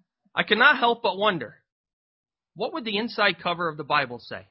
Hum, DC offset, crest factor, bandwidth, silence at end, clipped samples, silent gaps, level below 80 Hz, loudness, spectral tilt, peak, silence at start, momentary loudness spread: none; under 0.1%; 22 dB; 5.8 kHz; 0.1 s; under 0.1%; 1.72-1.84 s, 1.93-2.24 s; -70 dBFS; -23 LUFS; -8.5 dB/octave; -4 dBFS; 0.35 s; 15 LU